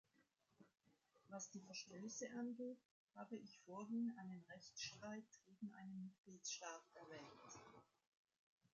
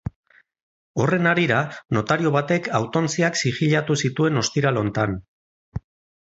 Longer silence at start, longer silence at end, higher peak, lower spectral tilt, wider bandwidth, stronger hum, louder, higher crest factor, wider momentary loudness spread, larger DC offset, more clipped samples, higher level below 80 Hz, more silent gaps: first, 0.2 s vs 0.05 s; first, 0.9 s vs 0.45 s; second, -38 dBFS vs -4 dBFS; second, -4 dB/octave vs -5.5 dB/octave; about the same, 7.6 kHz vs 8 kHz; neither; second, -54 LUFS vs -21 LUFS; about the same, 18 dB vs 18 dB; second, 12 LU vs 15 LU; neither; neither; second, under -90 dBFS vs -50 dBFS; second, 2.85-3.08 s, 6.18-6.24 s vs 0.16-0.23 s, 0.62-0.94 s, 5.28-5.72 s